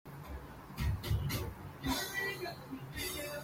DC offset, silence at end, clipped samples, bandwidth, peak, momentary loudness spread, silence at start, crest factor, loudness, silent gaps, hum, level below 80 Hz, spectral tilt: under 0.1%; 0 s; under 0.1%; 16.5 kHz; -22 dBFS; 12 LU; 0.05 s; 16 dB; -39 LUFS; none; none; -46 dBFS; -4.5 dB/octave